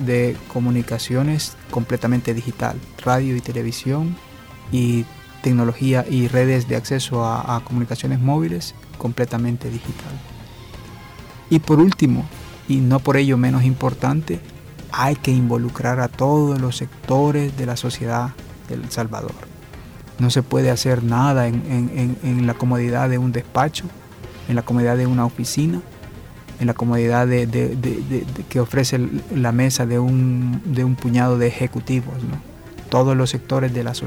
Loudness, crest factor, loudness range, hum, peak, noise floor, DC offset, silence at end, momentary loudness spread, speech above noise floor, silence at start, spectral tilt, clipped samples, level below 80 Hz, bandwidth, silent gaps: -20 LUFS; 14 dB; 4 LU; none; -6 dBFS; -38 dBFS; under 0.1%; 0 s; 17 LU; 20 dB; 0 s; -6.5 dB/octave; under 0.1%; -44 dBFS; 16 kHz; none